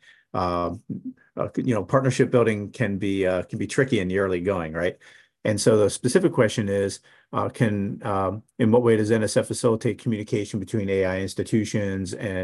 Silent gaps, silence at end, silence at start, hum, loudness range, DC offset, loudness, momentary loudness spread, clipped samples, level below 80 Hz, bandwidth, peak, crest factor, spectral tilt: none; 0 s; 0.35 s; none; 2 LU; under 0.1%; -24 LUFS; 9 LU; under 0.1%; -50 dBFS; 12.5 kHz; -4 dBFS; 18 dB; -6 dB/octave